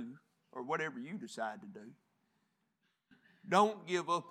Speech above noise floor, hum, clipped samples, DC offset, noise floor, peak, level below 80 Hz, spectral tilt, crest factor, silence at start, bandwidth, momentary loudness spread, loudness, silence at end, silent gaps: 45 dB; none; under 0.1%; under 0.1%; -81 dBFS; -14 dBFS; under -90 dBFS; -4.5 dB/octave; 26 dB; 0 s; 16 kHz; 22 LU; -36 LUFS; 0 s; none